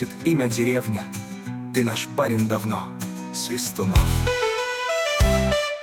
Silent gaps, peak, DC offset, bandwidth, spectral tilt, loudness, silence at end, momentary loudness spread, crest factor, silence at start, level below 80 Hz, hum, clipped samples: none; -6 dBFS; under 0.1%; 19.5 kHz; -5 dB/octave; -23 LUFS; 0 s; 11 LU; 16 dB; 0 s; -32 dBFS; none; under 0.1%